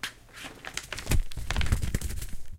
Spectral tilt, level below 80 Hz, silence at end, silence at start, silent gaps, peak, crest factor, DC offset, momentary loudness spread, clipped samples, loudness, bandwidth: -4 dB/octave; -34 dBFS; 0 s; 0.05 s; none; -8 dBFS; 20 dB; under 0.1%; 11 LU; under 0.1%; -33 LUFS; 16.5 kHz